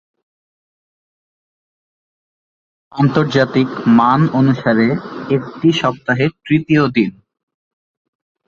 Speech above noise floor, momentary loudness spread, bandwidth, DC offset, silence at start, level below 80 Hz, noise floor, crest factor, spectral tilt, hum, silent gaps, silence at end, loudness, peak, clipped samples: over 76 dB; 7 LU; 7.4 kHz; under 0.1%; 2.95 s; -54 dBFS; under -90 dBFS; 16 dB; -7.5 dB/octave; none; none; 1.35 s; -15 LUFS; 0 dBFS; under 0.1%